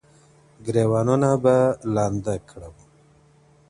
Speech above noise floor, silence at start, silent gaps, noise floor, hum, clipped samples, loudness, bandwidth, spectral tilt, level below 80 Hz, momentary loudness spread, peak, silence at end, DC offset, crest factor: 35 dB; 0.6 s; none; -56 dBFS; none; under 0.1%; -21 LUFS; 11 kHz; -7.5 dB/octave; -52 dBFS; 17 LU; -4 dBFS; 0.95 s; under 0.1%; 18 dB